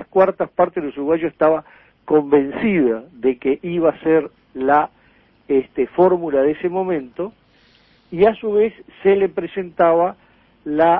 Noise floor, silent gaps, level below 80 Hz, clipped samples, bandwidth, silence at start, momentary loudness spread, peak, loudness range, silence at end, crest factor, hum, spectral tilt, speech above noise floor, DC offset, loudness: -54 dBFS; none; -54 dBFS; under 0.1%; 4.3 kHz; 0 s; 9 LU; -2 dBFS; 2 LU; 0 s; 16 dB; none; -10 dB/octave; 37 dB; under 0.1%; -18 LUFS